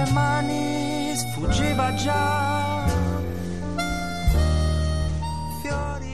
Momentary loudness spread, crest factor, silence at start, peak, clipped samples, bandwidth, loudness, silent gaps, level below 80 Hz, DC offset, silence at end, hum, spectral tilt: 7 LU; 14 dB; 0 s; -10 dBFS; under 0.1%; 13.5 kHz; -24 LUFS; none; -30 dBFS; 1%; 0 s; none; -5.5 dB/octave